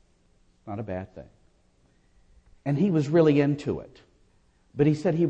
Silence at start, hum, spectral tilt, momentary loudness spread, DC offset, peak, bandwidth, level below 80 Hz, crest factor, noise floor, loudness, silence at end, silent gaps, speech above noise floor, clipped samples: 0.65 s; none; -8.5 dB/octave; 17 LU; under 0.1%; -10 dBFS; 8.4 kHz; -58 dBFS; 18 dB; -63 dBFS; -25 LUFS; 0 s; none; 39 dB; under 0.1%